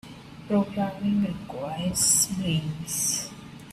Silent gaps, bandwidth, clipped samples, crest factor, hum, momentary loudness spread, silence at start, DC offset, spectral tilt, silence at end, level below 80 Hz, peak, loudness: none; 16 kHz; under 0.1%; 20 dB; none; 17 LU; 0.05 s; under 0.1%; -3.5 dB/octave; 0 s; -54 dBFS; -8 dBFS; -25 LUFS